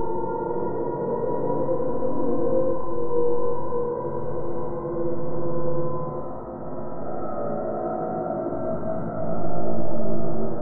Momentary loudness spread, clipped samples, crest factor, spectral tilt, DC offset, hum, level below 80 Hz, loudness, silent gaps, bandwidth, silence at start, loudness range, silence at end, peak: 6 LU; under 0.1%; 12 dB; -7 dB/octave; under 0.1%; none; -50 dBFS; -28 LUFS; none; 2.2 kHz; 0 s; 4 LU; 0 s; -8 dBFS